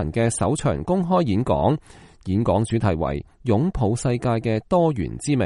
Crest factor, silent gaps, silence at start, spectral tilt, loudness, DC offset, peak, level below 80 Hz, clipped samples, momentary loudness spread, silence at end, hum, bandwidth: 16 dB; none; 0 s; -7 dB/octave; -22 LUFS; under 0.1%; -6 dBFS; -40 dBFS; under 0.1%; 6 LU; 0 s; none; 11.5 kHz